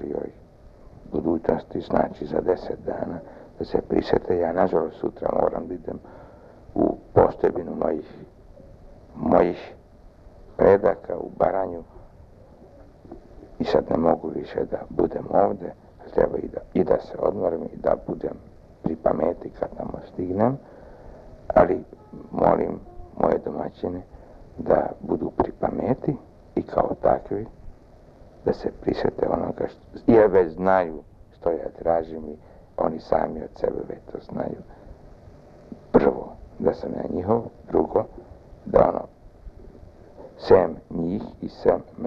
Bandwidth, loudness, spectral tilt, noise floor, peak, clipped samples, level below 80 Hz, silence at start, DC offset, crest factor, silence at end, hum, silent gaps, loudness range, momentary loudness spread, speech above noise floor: 6.4 kHz; -24 LUFS; -9.5 dB/octave; -49 dBFS; -2 dBFS; under 0.1%; -46 dBFS; 0 s; under 0.1%; 22 dB; 0 s; none; none; 5 LU; 17 LU; 26 dB